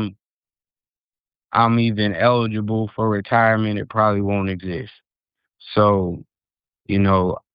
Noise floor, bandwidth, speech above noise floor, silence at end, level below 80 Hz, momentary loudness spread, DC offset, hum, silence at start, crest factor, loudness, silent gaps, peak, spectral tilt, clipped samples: under -90 dBFS; 5.2 kHz; over 71 dB; 0.15 s; -52 dBFS; 11 LU; under 0.1%; none; 0 s; 18 dB; -19 LUFS; 0.33-0.43 s, 1.00-1.10 s, 1.20-1.24 s; -2 dBFS; -11 dB/octave; under 0.1%